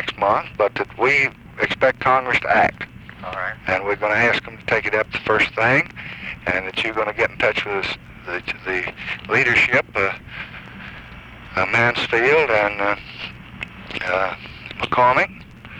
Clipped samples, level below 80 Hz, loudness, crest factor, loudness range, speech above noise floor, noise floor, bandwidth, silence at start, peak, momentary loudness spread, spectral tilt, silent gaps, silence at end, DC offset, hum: under 0.1%; -48 dBFS; -19 LUFS; 16 dB; 2 LU; 19 dB; -39 dBFS; 11.5 kHz; 0 s; -4 dBFS; 17 LU; -5 dB/octave; none; 0 s; under 0.1%; none